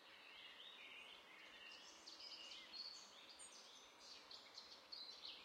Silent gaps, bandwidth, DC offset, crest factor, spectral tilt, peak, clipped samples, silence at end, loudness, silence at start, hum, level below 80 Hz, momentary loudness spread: none; 16 kHz; under 0.1%; 18 dB; 0.5 dB/octave; -42 dBFS; under 0.1%; 0 s; -57 LUFS; 0 s; none; under -90 dBFS; 7 LU